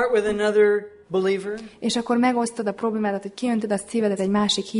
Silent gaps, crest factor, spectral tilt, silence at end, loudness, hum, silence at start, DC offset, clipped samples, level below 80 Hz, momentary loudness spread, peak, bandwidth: none; 16 dB; -4.5 dB/octave; 0 s; -23 LUFS; none; 0 s; under 0.1%; under 0.1%; -58 dBFS; 8 LU; -6 dBFS; 11 kHz